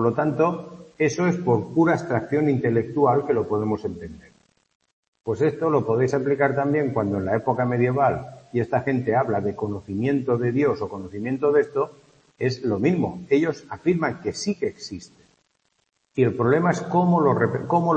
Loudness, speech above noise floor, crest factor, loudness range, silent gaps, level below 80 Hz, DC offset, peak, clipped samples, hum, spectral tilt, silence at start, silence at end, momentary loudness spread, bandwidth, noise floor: -23 LUFS; 48 dB; 18 dB; 3 LU; 4.75-4.80 s, 4.93-5.12 s; -58 dBFS; under 0.1%; -6 dBFS; under 0.1%; none; -7.5 dB/octave; 0 s; 0 s; 9 LU; 8.6 kHz; -70 dBFS